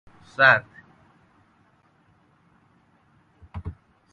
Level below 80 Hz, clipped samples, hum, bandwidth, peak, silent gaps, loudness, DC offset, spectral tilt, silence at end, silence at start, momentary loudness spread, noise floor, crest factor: -52 dBFS; under 0.1%; none; 7.4 kHz; -2 dBFS; none; -18 LUFS; under 0.1%; -5.5 dB/octave; 0.4 s; 0.4 s; 24 LU; -62 dBFS; 26 dB